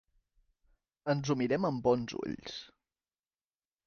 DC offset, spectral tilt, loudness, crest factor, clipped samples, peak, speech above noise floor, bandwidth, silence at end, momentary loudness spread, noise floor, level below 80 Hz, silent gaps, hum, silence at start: under 0.1%; -6.5 dB/octave; -33 LUFS; 20 dB; under 0.1%; -16 dBFS; over 58 dB; 6.8 kHz; 1.2 s; 12 LU; under -90 dBFS; -66 dBFS; none; none; 1.05 s